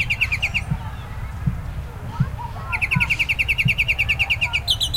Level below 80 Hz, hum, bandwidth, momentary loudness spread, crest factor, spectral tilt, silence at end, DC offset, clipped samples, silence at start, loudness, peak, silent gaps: -32 dBFS; none; 16.5 kHz; 15 LU; 16 dB; -3.5 dB/octave; 0 s; under 0.1%; under 0.1%; 0 s; -20 LUFS; -6 dBFS; none